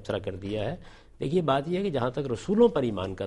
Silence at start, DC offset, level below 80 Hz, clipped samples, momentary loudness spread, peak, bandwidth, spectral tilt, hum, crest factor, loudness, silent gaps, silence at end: 0 s; under 0.1%; -52 dBFS; under 0.1%; 11 LU; -10 dBFS; 11 kHz; -7 dB/octave; none; 18 dB; -27 LUFS; none; 0 s